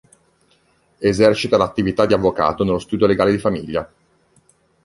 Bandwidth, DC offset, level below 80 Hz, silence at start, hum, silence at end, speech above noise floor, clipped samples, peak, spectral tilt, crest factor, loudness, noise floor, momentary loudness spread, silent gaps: 11.5 kHz; under 0.1%; -44 dBFS; 1 s; none; 1 s; 42 dB; under 0.1%; 0 dBFS; -6.5 dB/octave; 18 dB; -18 LUFS; -59 dBFS; 9 LU; none